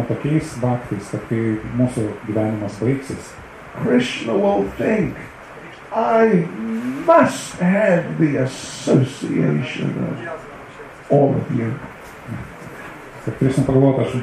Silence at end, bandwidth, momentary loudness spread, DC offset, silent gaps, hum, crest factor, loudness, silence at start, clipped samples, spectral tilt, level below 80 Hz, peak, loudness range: 0 s; 13.5 kHz; 20 LU; under 0.1%; none; none; 18 dB; -19 LUFS; 0 s; under 0.1%; -7 dB/octave; -48 dBFS; -2 dBFS; 5 LU